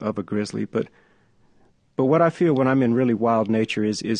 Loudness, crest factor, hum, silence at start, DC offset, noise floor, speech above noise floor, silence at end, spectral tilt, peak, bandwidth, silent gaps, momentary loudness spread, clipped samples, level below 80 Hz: -21 LUFS; 16 dB; none; 0 s; under 0.1%; -58 dBFS; 37 dB; 0 s; -6.5 dB/octave; -6 dBFS; 10 kHz; none; 9 LU; under 0.1%; -62 dBFS